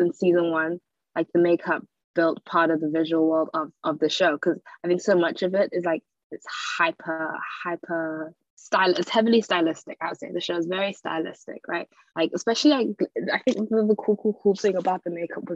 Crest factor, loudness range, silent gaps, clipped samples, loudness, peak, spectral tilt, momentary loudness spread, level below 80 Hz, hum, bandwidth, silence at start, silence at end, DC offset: 18 dB; 3 LU; 2.04-2.14 s, 6.24-6.30 s, 8.50-8.57 s; under 0.1%; -24 LUFS; -6 dBFS; -5 dB/octave; 11 LU; -76 dBFS; none; 8 kHz; 0 s; 0 s; under 0.1%